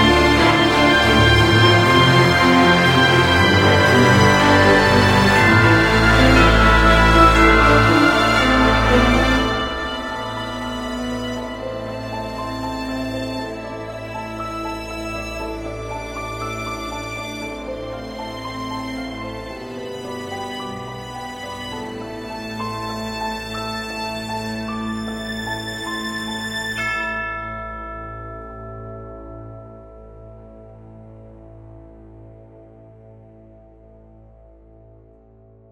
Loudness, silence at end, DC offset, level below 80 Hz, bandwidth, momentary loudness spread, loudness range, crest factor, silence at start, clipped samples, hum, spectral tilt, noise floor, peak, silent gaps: -16 LUFS; 3.4 s; under 0.1%; -30 dBFS; 16 kHz; 18 LU; 16 LU; 18 dB; 0 s; under 0.1%; none; -5 dB/octave; -48 dBFS; 0 dBFS; none